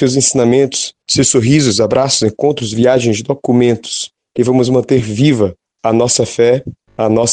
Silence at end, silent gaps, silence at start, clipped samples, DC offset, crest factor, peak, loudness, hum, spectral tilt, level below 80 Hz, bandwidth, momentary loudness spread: 0 s; none; 0 s; under 0.1%; under 0.1%; 12 dB; 0 dBFS; -13 LUFS; none; -4.5 dB/octave; -46 dBFS; 9.6 kHz; 8 LU